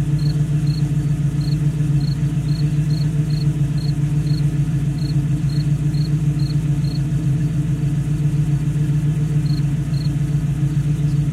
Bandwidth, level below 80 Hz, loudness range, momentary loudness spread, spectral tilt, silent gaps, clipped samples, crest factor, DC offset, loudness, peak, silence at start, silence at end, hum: 11 kHz; -32 dBFS; 0 LU; 1 LU; -8 dB/octave; none; under 0.1%; 10 dB; under 0.1%; -19 LUFS; -8 dBFS; 0 s; 0 s; none